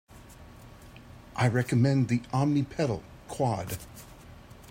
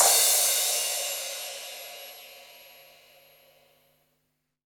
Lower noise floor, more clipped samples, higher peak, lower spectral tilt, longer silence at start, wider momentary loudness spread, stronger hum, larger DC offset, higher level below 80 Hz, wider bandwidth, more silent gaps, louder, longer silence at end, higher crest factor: second, -49 dBFS vs -77 dBFS; neither; second, -12 dBFS vs -6 dBFS; first, -7 dB/octave vs 3.5 dB/octave; first, 0.15 s vs 0 s; about the same, 25 LU vs 26 LU; second, none vs 50 Hz at -80 dBFS; neither; first, -54 dBFS vs -78 dBFS; second, 16 kHz vs over 20 kHz; neither; second, -28 LUFS vs -23 LUFS; second, 0 s vs 2.2 s; second, 18 dB vs 24 dB